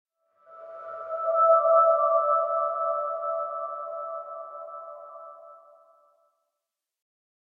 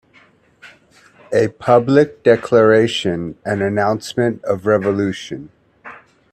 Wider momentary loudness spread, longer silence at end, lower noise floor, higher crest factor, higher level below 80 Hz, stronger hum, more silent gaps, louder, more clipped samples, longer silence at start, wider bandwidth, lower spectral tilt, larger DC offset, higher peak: first, 23 LU vs 11 LU; first, 1.85 s vs 0.4 s; first, -86 dBFS vs -52 dBFS; about the same, 18 dB vs 18 dB; second, under -90 dBFS vs -56 dBFS; neither; neither; second, -24 LUFS vs -16 LUFS; neither; second, 0.5 s vs 0.65 s; second, 2.4 kHz vs 12.5 kHz; about the same, -5.5 dB/octave vs -6 dB/octave; neither; second, -10 dBFS vs 0 dBFS